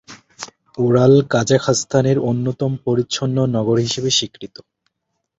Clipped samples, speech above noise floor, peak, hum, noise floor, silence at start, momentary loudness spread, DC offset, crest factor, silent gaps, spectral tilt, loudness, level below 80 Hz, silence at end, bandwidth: under 0.1%; 58 dB; -2 dBFS; none; -75 dBFS; 0.1 s; 20 LU; under 0.1%; 16 dB; none; -5 dB/octave; -17 LUFS; -52 dBFS; 0.95 s; 8 kHz